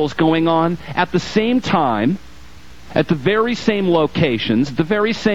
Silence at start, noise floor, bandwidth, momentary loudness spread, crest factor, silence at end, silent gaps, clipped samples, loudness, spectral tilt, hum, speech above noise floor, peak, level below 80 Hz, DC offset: 0 s; -41 dBFS; 8.6 kHz; 4 LU; 14 dB; 0 s; none; under 0.1%; -17 LUFS; -6.5 dB/octave; none; 25 dB; -2 dBFS; -46 dBFS; 1%